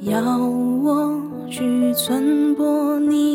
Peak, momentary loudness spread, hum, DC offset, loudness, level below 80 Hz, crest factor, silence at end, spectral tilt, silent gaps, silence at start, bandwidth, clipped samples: -4 dBFS; 6 LU; none; under 0.1%; -19 LUFS; -62 dBFS; 14 dB; 0 s; -5 dB/octave; none; 0 s; 17.5 kHz; under 0.1%